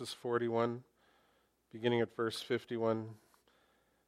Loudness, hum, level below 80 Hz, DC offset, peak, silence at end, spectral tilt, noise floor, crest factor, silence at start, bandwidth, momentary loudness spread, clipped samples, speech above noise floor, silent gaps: -36 LUFS; none; -80 dBFS; under 0.1%; -18 dBFS; 0.9 s; -6 dB/octave; -74 dBFS; 20 dB; 0 s; 15 kHz; 11 LU; under 0.1%; 38 dB; none